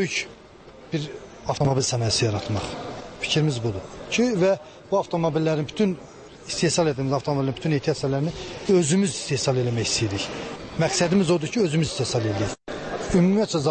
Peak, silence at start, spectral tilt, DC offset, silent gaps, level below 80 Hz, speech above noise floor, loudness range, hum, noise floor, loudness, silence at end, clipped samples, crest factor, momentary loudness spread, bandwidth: -10 dBFS; 0 s; -5 dB/octave; under 0.1%; none; -50 dBFS; 23 dB; 2 LU; none; -46 dBFS; -24 LUFS; 0 s; under 0.1%; 14 dB; 12 LU; 8.8 kHz